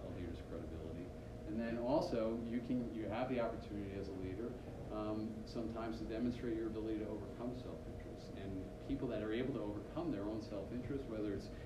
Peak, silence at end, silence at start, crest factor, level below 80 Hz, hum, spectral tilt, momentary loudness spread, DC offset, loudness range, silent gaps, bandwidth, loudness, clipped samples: -24 dBFS; 0 s; 0 s; 18 dB; -56 dBFS; none; -7.5 dB/octave; 9 LU; under 0.1%; 3 LU; none; 14 kHz; -43 LUFS; under 0.1%